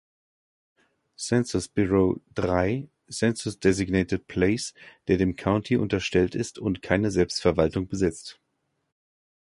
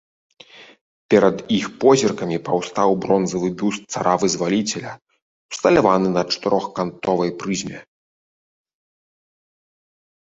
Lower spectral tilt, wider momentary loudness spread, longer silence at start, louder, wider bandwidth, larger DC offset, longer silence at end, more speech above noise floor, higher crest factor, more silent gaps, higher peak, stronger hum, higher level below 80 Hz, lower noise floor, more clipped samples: about the same, -5.5 dB/octave vs -5 dB/octave; second, 7 LU vs 10 LU; first, 1.2 s vs 0.55 s; second, -25 LUFS vs -19 LUFS; first, 11.5 kHz vs 8 kHz; neither; second, 1.3 s vs 2.5 s; second, 51 dB vs over 71 dB; about the same, 20 dB vs 20 dB; second, none vs 0.81-1.09 s, 5.22-5.49 s; second, -6 dBFS vs -2 dBFS; neither; first, -46 dBFS vs -56 dBFS; second, -76 dBFS vs under -90 dBFS; neither